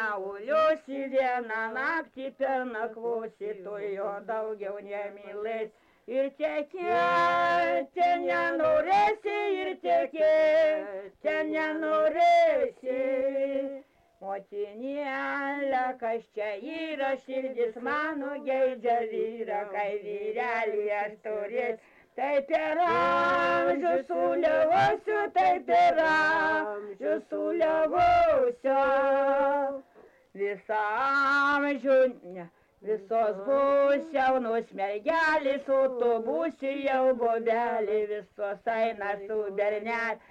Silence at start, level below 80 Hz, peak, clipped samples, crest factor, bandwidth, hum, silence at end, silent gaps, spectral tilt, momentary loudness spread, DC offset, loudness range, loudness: 0 s; -64 dBFS; -16 dBFS; under 0.1%; 10 dB; 8.6 kHz; none; 0.1 s; none; -5 dB/octave; 12 LU; under 0.1%; 7 LU; -27 LUFS